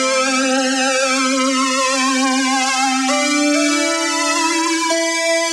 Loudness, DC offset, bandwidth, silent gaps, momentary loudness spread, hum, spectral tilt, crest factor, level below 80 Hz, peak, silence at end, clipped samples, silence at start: -15 LUFS; under 0.1%; 13.5 kHz; none; 1 LU; none; 0.5 dB/octave; 12 dB; -90 dBFS; -4 dBFS; 0 s; under 0.1%; 0 s